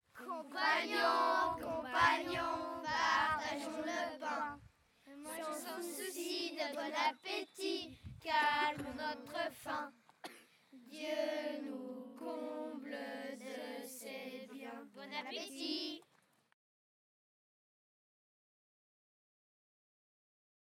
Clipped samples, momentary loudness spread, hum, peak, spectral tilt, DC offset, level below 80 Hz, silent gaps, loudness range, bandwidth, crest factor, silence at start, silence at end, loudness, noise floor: under 0.1%; 17 LU; none; -16 dBFS; -2.5 dB/octave; under 0.1%; -72 dBFS; none; 11 LU; 17.5 kHz; 24 dB; 0.15 s; 4.7 s; -39 LUFS; -74 dBFS